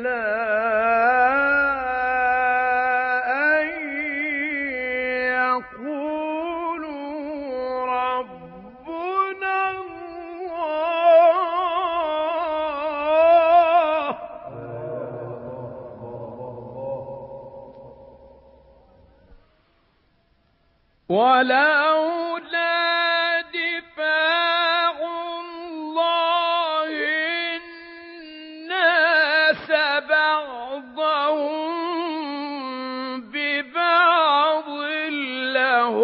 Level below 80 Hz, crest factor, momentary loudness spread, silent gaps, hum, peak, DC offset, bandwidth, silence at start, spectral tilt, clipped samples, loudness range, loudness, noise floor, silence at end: -60 dBFS; 18 dB; 19 LU; none; none; -4 dBFS; under 0.1%; 5.6 kHz; 0 s; -8 dB/octave; under 0.1%; 11 LU; -21 LUFS; -63 dBFS; 0 s